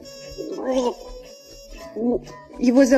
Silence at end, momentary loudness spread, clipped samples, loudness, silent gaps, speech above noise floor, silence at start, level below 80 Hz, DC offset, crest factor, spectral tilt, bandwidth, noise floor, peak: 0 s; 21 LU; under 0.1%; -24 LUFS; none; 24 dB; 0.05 s; -48 dBFS; under 0.1%; 18 dB; -4.5 dB/octave; 13.5 kHz; -43 dBFS; -4 dBFS